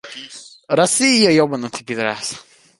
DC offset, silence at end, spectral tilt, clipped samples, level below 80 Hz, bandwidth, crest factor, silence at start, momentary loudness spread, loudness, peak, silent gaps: under 0.1%; 0.4 s; -3 dB/octave; under 0.1%; -62 dBFS; 12 kHz; 18 dB; 0.05 s; 22 LU; -16 LUFS; 0 dBFS; none